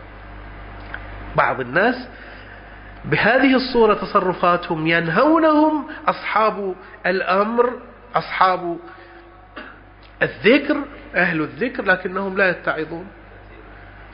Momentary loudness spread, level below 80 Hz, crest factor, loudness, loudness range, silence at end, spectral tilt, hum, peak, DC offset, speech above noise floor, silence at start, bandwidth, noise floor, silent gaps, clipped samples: 22 LU; -44 dBFS; 20 dB; -19 LUFS; 5 LU; 0 s; -10.5 dB/octave; none; 0 dBFS; under 0.1%; 25 dB; 0 s; 5.4 kHz; -43 dBFS; none; under 0.1%